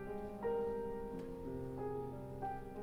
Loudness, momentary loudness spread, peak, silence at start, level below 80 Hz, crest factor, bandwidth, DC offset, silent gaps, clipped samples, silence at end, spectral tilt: -44 LUFS; 7 LU; -30 dBFS; 0 s; -56 dBFS; 14 dB; 15.5 kHz; under 0.1%; none; under 0.1%; 0 s; -8.5 dB/octave